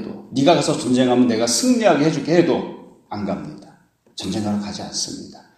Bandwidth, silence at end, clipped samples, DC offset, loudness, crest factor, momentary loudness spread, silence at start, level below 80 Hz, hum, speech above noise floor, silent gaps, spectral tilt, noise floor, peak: 14.5 kHz; 0.25 s; under 0.1%; under 0.1%; -19 LUFS; 20 dB; 16 LU; 0 s; -58 dBFS; none; 34 dB; none; -4.5 dB/octave; -52 dBFS; 0 dBFS